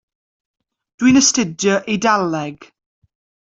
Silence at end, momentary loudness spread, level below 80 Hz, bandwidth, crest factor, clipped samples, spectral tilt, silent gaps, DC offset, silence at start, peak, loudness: 0.85 s; 11 LU; -54 dBFS; 8 kHz; 18 dB; under 0.1%; -3 dB/octave; none; under 0.1%; 1 s; 0 dBFS; -16 LUFS